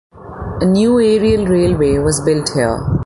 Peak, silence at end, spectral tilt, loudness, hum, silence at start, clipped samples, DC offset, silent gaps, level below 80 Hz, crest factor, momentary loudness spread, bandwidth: -2 dBFS; 0 s; -6 dB/octave; -14 LUFS; none; 0.15 s; under 0.1%; under 0.1%; none; -30 dBFS; 12 dB; 10 LU; 11.5 kHz